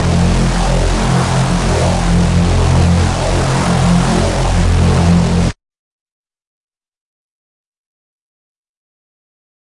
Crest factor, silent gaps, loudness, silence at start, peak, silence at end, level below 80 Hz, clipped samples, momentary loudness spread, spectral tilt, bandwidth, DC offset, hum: 14 dB; none; -13 LUFS; 0 s; 0 dBFS; 4.15 s; -22 dBFS; under 0.1%; 3 LU; -6 dB/octave; 11.5 kHz; under 0.1%; none